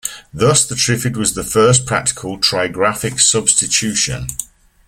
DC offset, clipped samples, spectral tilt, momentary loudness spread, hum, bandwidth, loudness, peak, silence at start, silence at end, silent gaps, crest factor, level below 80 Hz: under 0.1%; under 0.1%; -3 dB/octave; 7 LU; none; 16.5 kHz; -14 LUFS; 0 dBFS; 0.05 s; 0.45 s; none; 16 dB; -42 dBFS